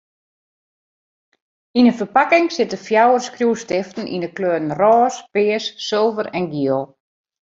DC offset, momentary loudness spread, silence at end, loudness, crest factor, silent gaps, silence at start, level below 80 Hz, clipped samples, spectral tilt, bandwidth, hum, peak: under 0.1%; 9 LU; 0.6 s; -18 LUFS; 18 dB; none; 1.75 s; -64 dBFS; under 0.1%; -5 dB/octave; 7.8 kHz; none; -2 dBFS